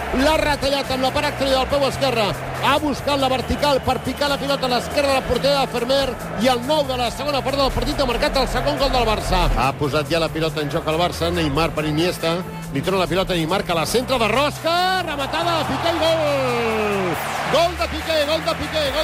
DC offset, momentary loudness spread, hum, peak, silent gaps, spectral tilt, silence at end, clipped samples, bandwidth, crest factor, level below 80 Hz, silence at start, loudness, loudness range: under 0.1%; 4 LU; none; -6 dBFS; none; -4.5 dB/octave; 0 s; under 0.1%; 16 kHz; 14 dB; -34 dBFS; 0 s; -20 LUFS; 1 LU